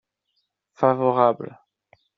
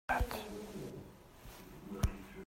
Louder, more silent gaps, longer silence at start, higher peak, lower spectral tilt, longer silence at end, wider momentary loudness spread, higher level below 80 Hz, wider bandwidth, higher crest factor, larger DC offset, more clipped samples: first, -21 LUFS vs -42 LUFS; neither; first, 0.8 s vs 0.1 s; first, -4 dBFS vs -20 dBFS; about the same, -6.5 dB/octave vs -5.5 dB/octave; first, 0.7 s vs 0 s; second, 14 LU vs 18 LU; second, -68 dBFS vs -46 dBFS; second, 6.2 kHz vs 16 kHz; about the same, 20 dB vs 20 dB; neither; neither